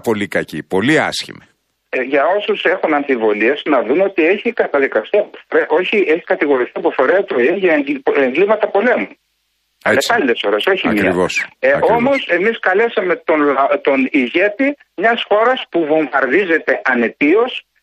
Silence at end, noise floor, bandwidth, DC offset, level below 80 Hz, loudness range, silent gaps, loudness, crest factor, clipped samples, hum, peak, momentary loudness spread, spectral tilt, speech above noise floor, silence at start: 0.25 s; -66 dBFS; 14 kHz; under 0.1%; -58 dBFS; 1 LU; none; -15 LUFS; 14 dB; under 0.1%; none; -2 dBFS; 5 LU; -4.5 dB/octave; 51 dB; 0.05 s